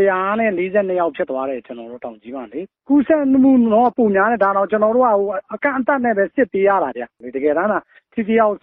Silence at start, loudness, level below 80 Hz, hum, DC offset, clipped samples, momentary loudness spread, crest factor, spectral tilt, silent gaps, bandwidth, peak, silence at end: 0 s; -17 LUFS; -58 dBFS; none; under 0.1%; under 0.1%; 17 LU; 14 dB; -10.5 dB/octave; none; 3.8 kHz; -4 dBFS; 0.05 s